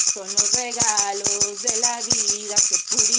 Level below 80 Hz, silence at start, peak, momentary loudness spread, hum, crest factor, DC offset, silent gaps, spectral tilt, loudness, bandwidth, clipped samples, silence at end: -60 dBFS; 0 s; -2 dBFS; 2 LU; none; 20 dB; under 0.1%; none; 0.5 dB/octave; -19 LUFS; 10.5 kHz; under 0.1%; 0 s